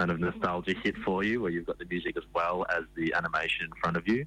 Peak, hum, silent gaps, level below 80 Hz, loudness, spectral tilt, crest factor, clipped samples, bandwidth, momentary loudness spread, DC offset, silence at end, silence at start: -18 dBFS; none; none; -54 dBFS; -31 LUFS; -6.5 dB/octave; 12 dB; under 0.1%; 10 kHz; 5 LU; under 0.1%; 0 s; 0 s